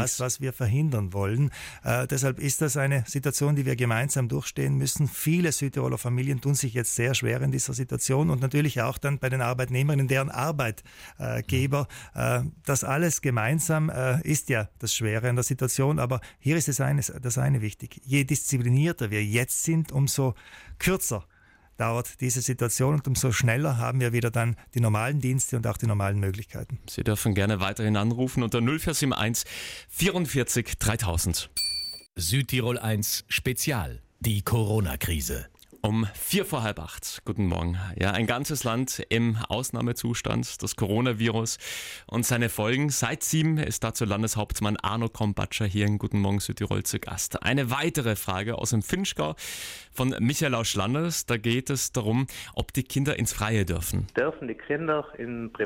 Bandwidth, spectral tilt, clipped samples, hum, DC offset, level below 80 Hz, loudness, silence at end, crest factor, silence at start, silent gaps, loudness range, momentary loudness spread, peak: 16.5 kHz; -4.5 dB/octave; under 0.1%; none; under 0.1%; -46 dBFS; -27 LUFS; 0 s; 14 dB; 0 s; none; 2 LU; 6 LU; -12 dBFS